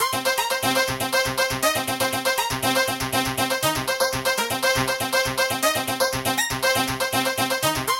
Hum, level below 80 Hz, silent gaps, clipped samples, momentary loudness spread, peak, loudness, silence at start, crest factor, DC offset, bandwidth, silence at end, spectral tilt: none; -48 dBFS; none; under 0.1%; 2 LU; -6 dBFS; -22 LUFS; 0 s; 16 dB; under 0.1%; 17 kHz; 0 s; -2.5 dB/octave